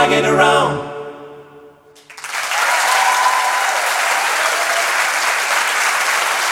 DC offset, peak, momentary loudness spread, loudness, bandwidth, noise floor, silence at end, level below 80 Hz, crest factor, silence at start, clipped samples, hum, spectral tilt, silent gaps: under 0.1%; 0 dBFS; 12 LU; -15 LUFS; 17.5 kHz; -44 dBFS; 0 s; -56 dBFS; 16 dB; 0 s; under 0.1%; none; -1.5 dB/octave; none